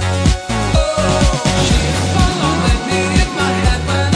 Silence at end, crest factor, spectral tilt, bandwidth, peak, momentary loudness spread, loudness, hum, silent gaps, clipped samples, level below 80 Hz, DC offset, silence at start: 0 s; 12 dB; -5 dB/octave; 11 kHz; -2 dBFS; 2 LU; -15 LUFS; none; none; under 0.1%; -20 dBFS; under 0.1%; 0 s